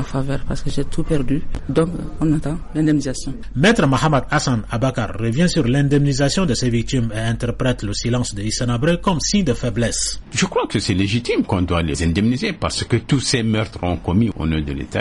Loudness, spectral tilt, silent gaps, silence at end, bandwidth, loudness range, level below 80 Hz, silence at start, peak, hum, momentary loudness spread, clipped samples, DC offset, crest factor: -19 LUFS; -5 dB/octave; none; 0 s; 11.5 kHz; 2 LU; -30 dBFS; 0 s; -4 dBFS; none; 7 LU; under 0.1%; under 0.1%; 14 dB